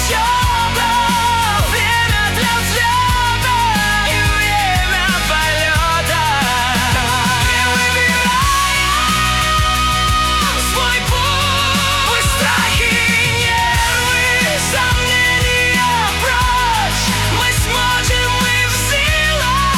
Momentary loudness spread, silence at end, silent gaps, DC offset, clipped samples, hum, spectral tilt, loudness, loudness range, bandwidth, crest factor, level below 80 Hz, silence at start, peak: 2 LU; 0 s; none; under 0.1%; under 0.1%; none; -2.5 dB/octave; -13 LUFS; 1 LU; 18 kHz; 10 dB; -24 dBFS; 0 s; -4 dBFS